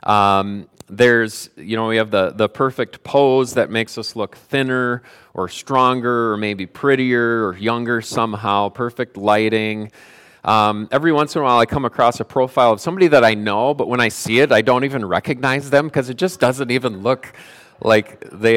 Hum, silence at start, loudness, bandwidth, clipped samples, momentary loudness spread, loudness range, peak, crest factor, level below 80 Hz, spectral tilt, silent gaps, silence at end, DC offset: none; 0.05 s; -17 LUFS; 16.5 kHz; under 0.1%; 11 LU; 4 LU; -2 dBFS; 16 dB; -54 dBFS; -5 dB/octave; none; 0 s; under 0.1%